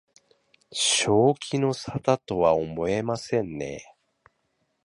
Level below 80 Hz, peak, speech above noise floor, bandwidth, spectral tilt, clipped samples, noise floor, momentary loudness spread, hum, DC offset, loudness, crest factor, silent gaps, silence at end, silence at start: -56 dBFS; -6 dBFS; 49 dB; 11.5 kHz; -4 dB/octave; under 0.1%; -74 dBFS; 13 LU; none; under 0.1%; -24 LUFS; 20 dB; none; 1 s; 0.7 s